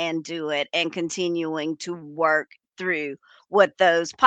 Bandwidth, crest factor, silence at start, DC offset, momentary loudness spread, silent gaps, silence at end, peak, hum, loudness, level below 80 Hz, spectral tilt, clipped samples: 9.2 kHz; 22 dB; 0 s; under 0.1%; 13 LU; none; 0 s; -2 dBFS; none; -24 LUFS; -76 dBFS; -3.5 dB/octave; under 0.1%